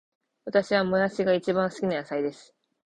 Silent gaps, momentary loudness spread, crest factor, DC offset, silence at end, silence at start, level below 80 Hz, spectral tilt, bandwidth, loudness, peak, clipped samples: none; 7 LU; 18 dB; under 0.1%; 0.55 s; 0.45 s; -64 dBFS; -6 dB/octave; 9.4 kHz; -26 LUFS; -8 dBFS; under 0.1%